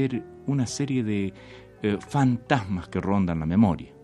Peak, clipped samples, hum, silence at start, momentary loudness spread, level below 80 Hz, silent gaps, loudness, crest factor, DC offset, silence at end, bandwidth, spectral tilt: -4 dBFS; under 0.1%; none; 0 s; 8 LU; -50 dBFS; none; -26 LUFS; 20 dB; under 0.1%; 0.1 s; 11.5 kHz; -6.5 dB/octave